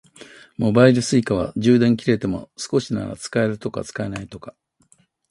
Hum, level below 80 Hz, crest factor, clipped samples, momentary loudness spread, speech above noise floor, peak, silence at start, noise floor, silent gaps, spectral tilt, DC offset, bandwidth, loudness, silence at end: none; -50 dBFS; 20 dB; under 0.1%; 14 LU; 40 dB; 0 dBFS; 0.2 s; -59 dBFS; none; -6 dB/octave; under 0.1%; 11.5 kHz; -20 LUFS; 0.8 s